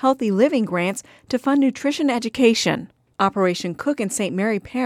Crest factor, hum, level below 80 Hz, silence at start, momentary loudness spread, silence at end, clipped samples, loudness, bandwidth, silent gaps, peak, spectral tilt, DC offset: 16 dB; none; -60 dBFS; 0 s; 7 LU; 0 s; under 0.1%; -21 LUFS; 15 kHz; none; -4 dBFS; -4.5 dB/octave; under 0.1%